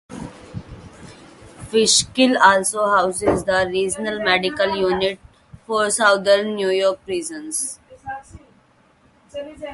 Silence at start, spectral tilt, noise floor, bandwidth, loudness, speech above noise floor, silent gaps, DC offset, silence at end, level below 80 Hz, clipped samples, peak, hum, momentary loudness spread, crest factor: 0.1 s; -2.5 dB/octave; -56 dBFS; 12 kHz; -18 LUFS; 37 dB; none; under 0.1%; 0 s; -50 dBFS; under 0.1%; 0 dBFS; none; 21 LU; 20 dB